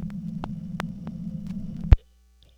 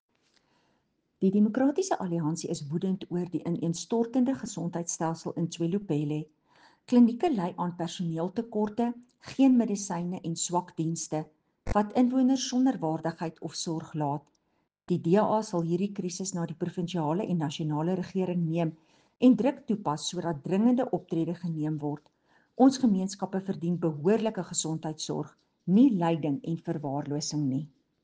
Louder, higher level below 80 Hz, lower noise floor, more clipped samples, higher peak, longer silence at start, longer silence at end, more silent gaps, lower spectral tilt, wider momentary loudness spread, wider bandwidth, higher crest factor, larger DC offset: about the same, -29 LUFS vs -29 LUFS; first, -30 dBFS vs -58 dBFS; second, -57 dBFS vs -76 dBFS; neither; first, 0 dBFS vs -10 dBFS; second, 0 s vs 1.2 s; first, 0.6 s vs 0.35 s; neither; first, -8.5 dB/octave vs -6 dB/octave; about the same, 13 LU vs 11 LU; second, 8.4 kHz vs 9.8 kHz; first, 26 dB vs 20 dB; neither